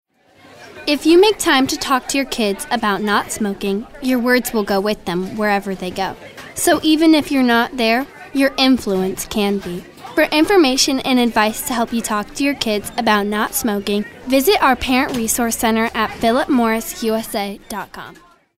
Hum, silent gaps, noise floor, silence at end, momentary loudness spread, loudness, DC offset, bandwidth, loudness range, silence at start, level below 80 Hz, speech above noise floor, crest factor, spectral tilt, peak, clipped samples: none; none; -48 dBFS; 0.45 s; 10 LU; -17 LUFS; under 0.1%; 16 kHz; 3 LU; 0.6 s; -44 dBFS; 31 dB; 16 dB; -3.5 dB/octave; 0 dBFS; under 0.1%